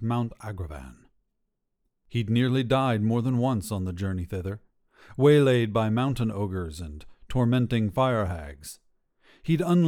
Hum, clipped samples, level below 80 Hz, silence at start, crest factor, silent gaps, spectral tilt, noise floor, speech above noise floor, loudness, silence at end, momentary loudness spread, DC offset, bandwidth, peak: none; under 0.1%; -48 dBFS; 0 s; 18 dB; none; -7.5 dB/octave; -77 dBFS; 52 dB; -26 LUFS; 0 s; 18 LU; under 0.1%; 16 kHz; -8 dBFS